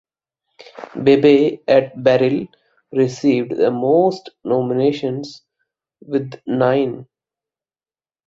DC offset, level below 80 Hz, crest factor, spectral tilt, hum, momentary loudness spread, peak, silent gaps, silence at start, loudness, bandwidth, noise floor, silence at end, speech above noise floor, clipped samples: under 0.1%; -60 dBFS; 18 dB; -7 dB/octave; none; 16 LU; -2 dBFS; none; 0.75 s; -17 LUFS; 7.6 kHz; under -90 dBFS; 1.25 s; over 74 dB; under 0.1%